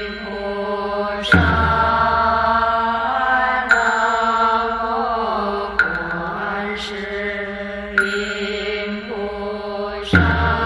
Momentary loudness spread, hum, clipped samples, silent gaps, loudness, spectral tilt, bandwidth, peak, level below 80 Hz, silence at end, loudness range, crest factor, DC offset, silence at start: 10 LU; none; under 0.1%; none; -19 LUFS; -5.5 dB/octave; 11.5 kHz; -2 dBFS; -34 dBFS; 0 s; 7 LU; 18 dB; under 0.1%; 0 s